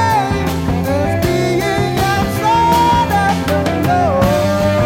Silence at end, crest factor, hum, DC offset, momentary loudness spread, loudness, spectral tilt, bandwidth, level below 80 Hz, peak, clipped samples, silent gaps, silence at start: 0 s; 12 dB; none; under 0.1%; 5 LU; -14 LUFS; -6 dB/octave; 17 kHz; -30 dBFS; -2 dBFS; under 0.1%; none; 0 s